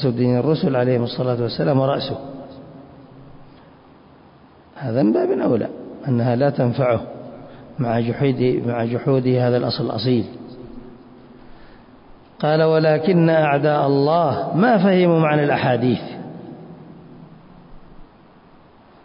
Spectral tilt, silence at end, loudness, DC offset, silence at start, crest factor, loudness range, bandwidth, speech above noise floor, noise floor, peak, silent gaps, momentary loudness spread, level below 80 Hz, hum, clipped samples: -12 dB/octave; 1 s; -19 LUFS; under 0.1%; 0 s; 14 dB; 9 LU; 5.4 kHz; 31 dB; -48 dBFS; -6 dBFS; none; 21 LU; -54 dBFS; none; under 0.1%